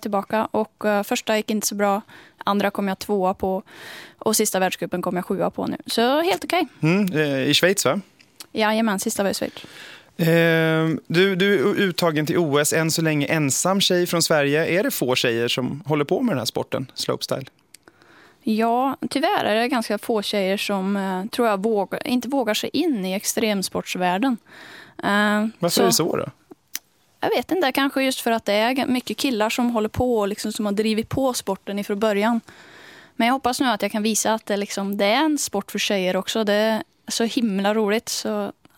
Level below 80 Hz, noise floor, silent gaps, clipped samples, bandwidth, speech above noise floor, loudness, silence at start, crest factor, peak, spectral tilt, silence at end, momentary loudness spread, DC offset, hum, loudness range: -56 dBFS; -52 dBFS; none; under 0.1%; 17 kHz; 30 dB; -21 LUFS; 0 s; 18 dB; -4 dBFS; -4 dB/octave; 0.25 s; 9 LU; under 0.1%; none; 4 LU